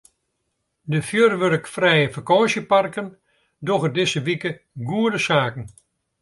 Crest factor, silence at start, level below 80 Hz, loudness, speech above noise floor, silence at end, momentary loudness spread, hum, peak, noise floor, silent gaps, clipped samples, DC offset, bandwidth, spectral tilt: 18 dB; 0.85 s; -60 dBFS; -20 LUFS; 54 dB; 0.55 s; 15 LU; none; -4 dBFS; -75 dBFS; none; under 0.1%; under 0.1%; 11.5 kHz; -5 dB/octave